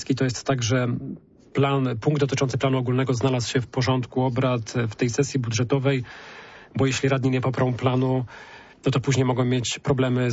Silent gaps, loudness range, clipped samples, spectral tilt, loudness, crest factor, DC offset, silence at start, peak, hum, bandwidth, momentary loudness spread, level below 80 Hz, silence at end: none; 1 LU; under 0.1%; -6 dB/octave; -24 LUFS; 14 dB; under 0.1%; 0 s; -10 dBFS; none; 8 kHz; 10 LU; -54 dBFS; 0 s